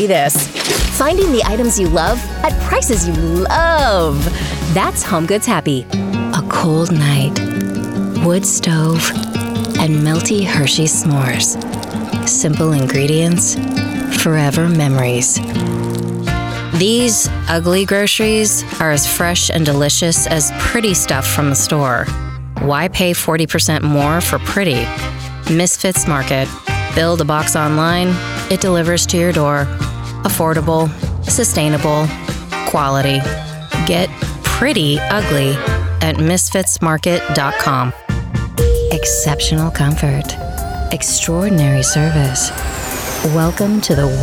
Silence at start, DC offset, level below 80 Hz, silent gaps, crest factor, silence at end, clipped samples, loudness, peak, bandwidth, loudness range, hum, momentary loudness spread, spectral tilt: 0 s; under 0.1%; -28 dBFS; none; 12 dB; 0 s; under 0.1%; -15 LUFS; -2 dBFS; 18 kHz; 3 LU; none; 7 LU; -4 dB/octave